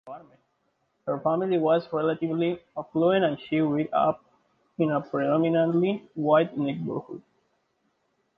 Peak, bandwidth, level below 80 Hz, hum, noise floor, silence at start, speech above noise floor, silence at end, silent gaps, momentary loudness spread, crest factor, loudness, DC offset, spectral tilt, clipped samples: -8 dBFS; 5.2 kHz; -70 dBFS; none; -73 dBFS; 0.05 s; 48 dB; 1.15 s; none; 14 LU; 18 dB; -26 LUFS; under 0.1%; -10 dB/octave; under 0.1%